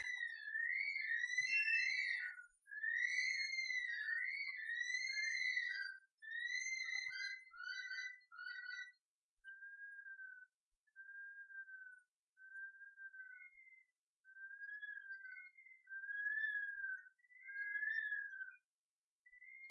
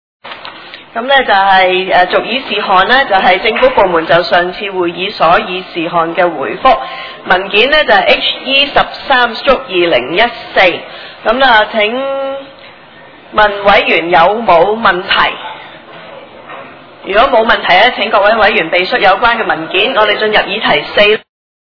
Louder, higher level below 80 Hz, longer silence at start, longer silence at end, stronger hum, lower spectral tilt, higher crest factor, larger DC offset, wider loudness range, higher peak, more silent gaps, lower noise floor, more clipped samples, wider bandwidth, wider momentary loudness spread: second, -42 LUFS vs -9 LUFS; second, under -90 dBFS vs -38 dBFS; second, 0 s vs 0.25 s; second, 0 s vs 0.45 s; neither; second, 5.5 dB/octave vs -5.5 dB/octave; first, 18 dB vs 10 dB; neither; first, 17 LU vs 3 LU; second, -28 dBFS vs 0 dBFS; first, 6.12-6.18 s, 9.01-9.37 s, 10.54-10.87 s, 12.08-12.36 s, 13.98-14.24 s, 18.65-19.25 s vs none; first, under -90 dBFS vs -36 dBFS; second, under 0.1% vs 0.6%; first, 11 kHz vs 5.4 kHz; first, 19 LU vs 14 LU